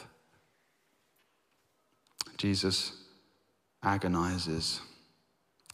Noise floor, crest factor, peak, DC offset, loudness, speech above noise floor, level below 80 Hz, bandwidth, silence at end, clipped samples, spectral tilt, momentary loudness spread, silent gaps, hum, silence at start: -74 dBFS; 24 dB; -14 dBFS; under 0.1%; -32 LUFS; 43 dB; -64 dBFS; 15.5 kHz; 0.85 s; under 0.1%; -4 dB/octave; 11 LU; none; none; 0 s